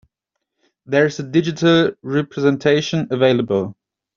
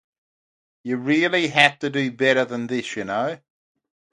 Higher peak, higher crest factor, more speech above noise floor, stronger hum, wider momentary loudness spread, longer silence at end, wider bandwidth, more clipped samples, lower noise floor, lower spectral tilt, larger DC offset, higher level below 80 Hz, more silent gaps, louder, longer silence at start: about the same, -2 dBFS vs 0 dBFS; second, 16 dB vs 24 dB; second, 62 dB vs over 69 dB; neither; second, 7 LU vs 12 LU; second, 0.45 s vs 0.75 s; second, 7.4 kHz vs 11.5 kHz; neither; second, -79 dBFS vs under -90 dBFS; about the same, -5 dB/octave vs -4.5 dB/octave; neither; first, -58 dBFS vs -68 dBFS; neither; first, -18 LUFS vs -21 LUFS; about the same, 0.9 s vs 0.85 s